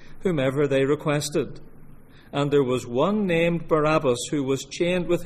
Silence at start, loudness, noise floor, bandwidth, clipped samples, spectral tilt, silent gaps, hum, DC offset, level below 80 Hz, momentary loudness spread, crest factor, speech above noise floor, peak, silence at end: 0 s; -23 LUFS; -45 dBFS; 15 kHz; under 0.1%; -5.5 dB/octave; none; none; under 0.1%; -44 dBFS; 6 LU; 14 dB; 22 dB; -8 dBFS; 0 s